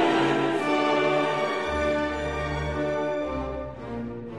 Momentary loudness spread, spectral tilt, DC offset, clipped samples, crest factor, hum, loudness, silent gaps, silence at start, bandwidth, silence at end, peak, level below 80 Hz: 12 LU; -5.5 dB/octave; 0.2%; under 0.1%; 14 dB; none; -26 LUFS; none; 0 s; 12 kHz; 0 s; -12 dBFS; -42 dBFS